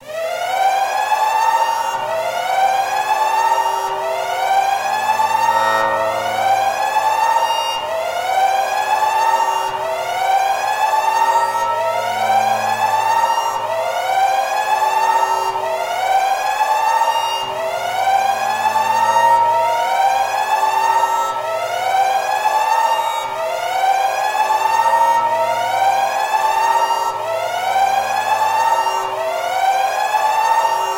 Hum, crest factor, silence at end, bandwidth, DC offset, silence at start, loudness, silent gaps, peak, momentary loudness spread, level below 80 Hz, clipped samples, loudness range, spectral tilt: none; 14 dB; 0 s; 16 kHz; under 0.1%; 0 s; -17 LUFS; none; -2 dBFS; 5 LU; -64 dBFS; under 0.1%; 2 LU; -1 dB/octave